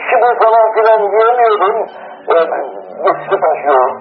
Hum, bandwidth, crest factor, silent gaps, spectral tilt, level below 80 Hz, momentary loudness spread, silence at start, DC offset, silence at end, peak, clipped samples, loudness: none; 5.2 kHz; 12 dB; none; -7.5 dB/octave; -68 dBFS; 11 LU; 0 s; under 0.1%; 0 s; 0 dBFS; under 0.1%; -12 LUFS